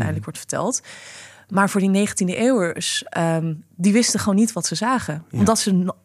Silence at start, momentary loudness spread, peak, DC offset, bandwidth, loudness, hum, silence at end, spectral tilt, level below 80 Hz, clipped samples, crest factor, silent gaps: 0 s; 11 LU; -4 dBFS; under 0.1%; 14.5 kHz; -20 LUFS; none; 0.1 s; -4.5 dB/octave; -58 dBFS; under 0.1%; 16 dB; none